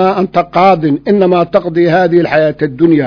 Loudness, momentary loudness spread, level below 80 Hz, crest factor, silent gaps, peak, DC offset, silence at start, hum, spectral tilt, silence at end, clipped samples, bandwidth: -10 LUFS; 4 LU; -46 dBFS; 10 dB; none; 0 dBFS; under 0.1%; 0 s; none; -8.5 dB/octave; 0 s; 0.9%; 5.4 kHz